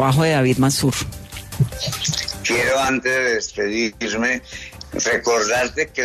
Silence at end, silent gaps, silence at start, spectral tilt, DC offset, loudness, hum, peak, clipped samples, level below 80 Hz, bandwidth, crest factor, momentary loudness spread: 0 s; none; 0 s; -4 dB/octave; under 0.1%; -19 LUFS; none; -6 dBFS; under 0.1%; -42 dBFS; 13.5 kHz; 14 dB; 11 LU